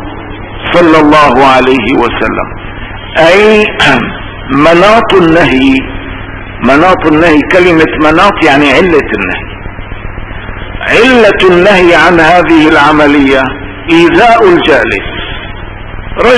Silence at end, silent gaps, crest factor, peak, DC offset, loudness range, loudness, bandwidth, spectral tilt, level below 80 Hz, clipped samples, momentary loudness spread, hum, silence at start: 0 s; none; 6 dB; 0 dBFS; under 0.1%; 3 LU; -5 LUFS; 11 kHz; -5.5 dB/octave; -24 dBFS; 9%; 18 LU; none; 0 s